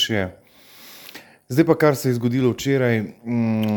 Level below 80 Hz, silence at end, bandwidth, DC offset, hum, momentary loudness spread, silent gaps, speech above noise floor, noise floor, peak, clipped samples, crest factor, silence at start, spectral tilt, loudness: -58 dBFS; 0 s; over 20 kHz; under 0.1%; none; 22 LU; none; 27 dB; -46 dBFS; -2 dBFS; under 0.1%; 20 dB; 0 s; -6 dB/octave; -20 LUFS